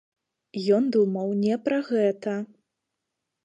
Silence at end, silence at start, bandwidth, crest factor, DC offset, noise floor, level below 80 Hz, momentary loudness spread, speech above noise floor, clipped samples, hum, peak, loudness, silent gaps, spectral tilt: 1 s; 0.55 s; 9.4 kHz; 16 dB; under 0.1%; -83 dBFS; -76 dBFS; 11 LU; 59 dB; under 0.1%; none; -10 dBFS; -25 LUFS; none; -7.5 dB/octave